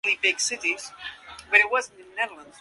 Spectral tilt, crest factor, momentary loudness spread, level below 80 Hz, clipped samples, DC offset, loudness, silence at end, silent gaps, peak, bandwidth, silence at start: 1 dB/octave; 22 dB; 19 LU; -66 dBFS; under 0.1%; under 0.1%; -23 LUFS; 0.2 s; none; -4 dBFS; 11.5 kHz; 0.05 s